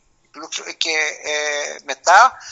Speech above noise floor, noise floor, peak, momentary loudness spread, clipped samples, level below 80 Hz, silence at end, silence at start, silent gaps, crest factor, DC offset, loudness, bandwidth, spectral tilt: 21 dB; -39 dBFS; 0 dBFS; 16 LU; under 0.1%; -68 dBFS; 0 s; 0.35 s; none; 18 dB; under 0.1%; -17 LUFS; 8.2 kHz; 1.5 dB/octave